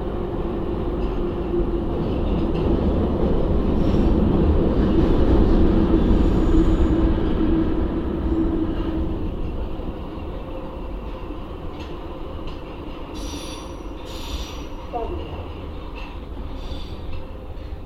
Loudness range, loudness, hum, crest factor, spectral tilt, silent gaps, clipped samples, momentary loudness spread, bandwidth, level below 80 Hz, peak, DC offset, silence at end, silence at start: 14 LU; -23 LUFS; none; 18 dB; -8 dB/octave; none; under 0.1%; 16 LU; 11 kHz; -24 dBFS; -4 dBFS; 0.3%; 0 s; 0 s